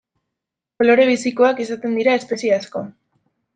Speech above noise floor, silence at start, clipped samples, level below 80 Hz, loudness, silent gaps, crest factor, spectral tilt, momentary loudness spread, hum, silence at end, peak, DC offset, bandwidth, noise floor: 66 dB; 0.8 s; under 0.1%; -66 dBFS; -17 LUFS; none; 16 dB; -4.5 dB/octave; 14 LU; none; 0.65 s; -2 dBFS; under 0.1%; 9.2 kHz; -83 dBFS